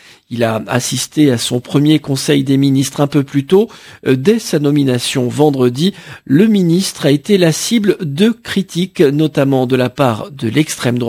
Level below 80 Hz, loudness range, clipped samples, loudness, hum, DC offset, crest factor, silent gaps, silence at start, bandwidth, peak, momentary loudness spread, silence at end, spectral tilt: -52 dBFS; 1 LU; under 0.1%; -14 LUFS; none; under 0.1%; 14 dB; none; 0.3 s; 16 kHz; 0 dBFS; 5 LU; 0 s; -5.5 dB/octave